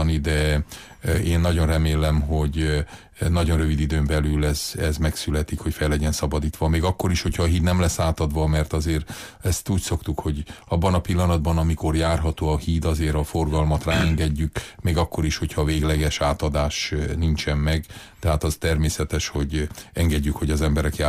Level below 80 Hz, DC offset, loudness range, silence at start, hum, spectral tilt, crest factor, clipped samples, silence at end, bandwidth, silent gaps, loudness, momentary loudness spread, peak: -28 dBFS; under 0.1%; 2 LU; 0 s; none; -5.5 dB/octave; 12 dB; under 0.1%; 0 s; 15.5 kHz; none; -23 LUFS; 6 LU; -10 dBFS